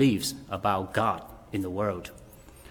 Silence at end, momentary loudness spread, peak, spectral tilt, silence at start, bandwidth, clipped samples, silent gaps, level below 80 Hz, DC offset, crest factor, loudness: 0 s; 17 LU; -10 dBFS; -5 dB/octave; 0 s; 19.5 kHz; under 0.1%; none; -56 dBFS; under 0.1%; 20 dB; -30 LUFS